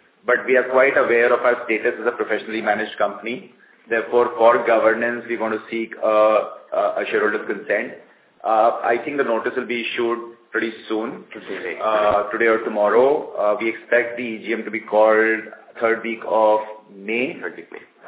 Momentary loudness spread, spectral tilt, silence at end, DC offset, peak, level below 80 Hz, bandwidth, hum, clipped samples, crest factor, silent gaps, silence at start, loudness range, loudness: 13 LU; -8 dB/octave; 0 s; under 0.1%; -2 dBFS; -66 dBFS; 4 kHz; none; under 0.1%; 18 dB; none; 0.25 s; 3 LU; -20 LUFS